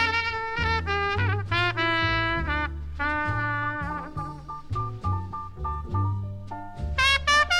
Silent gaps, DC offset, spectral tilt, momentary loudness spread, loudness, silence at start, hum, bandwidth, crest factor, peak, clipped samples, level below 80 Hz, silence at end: none; 0.1%; -4 dB/octave; 13 LU; -26 LUFS; 0 s; none; 12.5 kHz; 18 dB; -8 dBFS; under 0.1%; -38 dBFS; 0 s